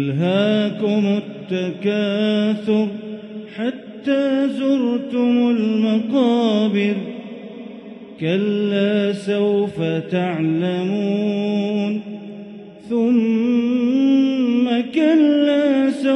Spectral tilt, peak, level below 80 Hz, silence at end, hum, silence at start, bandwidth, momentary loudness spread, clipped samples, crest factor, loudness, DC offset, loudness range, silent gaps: -7.5 dB/octave; -6 dBFS; -68 dBFS; 0 s; none; 0 s; 9 kHz; 16 LU; under 0.1%; 14 dB; -19 LUFS; under 0.1%; 4 LU; none